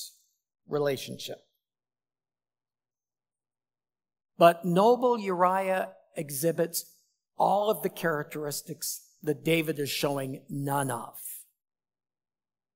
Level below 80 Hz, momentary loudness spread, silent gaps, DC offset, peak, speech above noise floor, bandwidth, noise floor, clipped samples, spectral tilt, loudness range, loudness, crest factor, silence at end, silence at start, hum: -82 dBFS; 16 LU; none; under 0.1%; -6 dBFS; over 62 dB; 16 kHz; under -90 dBFS; under 0.1%; -4.5 dB/octave; 12 LU; -28 LUFS; 24 dB; 1.35 s; 0 s; none